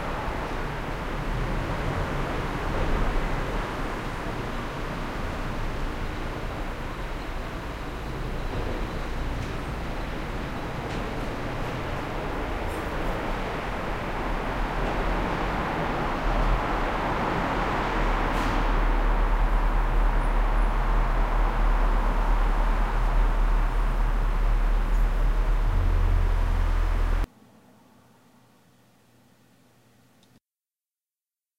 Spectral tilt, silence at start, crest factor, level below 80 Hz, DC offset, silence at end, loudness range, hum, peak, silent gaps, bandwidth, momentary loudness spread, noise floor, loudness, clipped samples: -6.5 dB/octave; 0 s; 14 dB; -26 dBFS; 0.2%; 4.35 s; 7 LU; none; -12 dBFS; none; 10 kHz; 7 LU; under -90 dBFS; -29 LUFS; under 0.1%